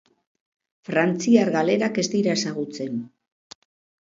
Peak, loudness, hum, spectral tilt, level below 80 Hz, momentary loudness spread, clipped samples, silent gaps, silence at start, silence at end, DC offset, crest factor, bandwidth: -4 dBFS; -22 LUFS; none; -5 dB/octave; -70 dBFS; 13 LU; under 0.1%; none; 0.9 s; 1 s; under 0.1%; 20 dB; 7.8 kHz